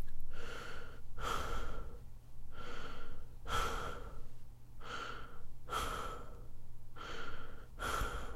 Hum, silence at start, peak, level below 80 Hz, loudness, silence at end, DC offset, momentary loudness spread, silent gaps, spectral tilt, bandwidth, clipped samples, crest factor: none; 0 s; -22 dBFS; -44 dBFS; -44 LUFS; 0 s; under 0.1%; 17 LU; none; -3.5 dB/octave; 14 kHz; under 0.1%; 14 dB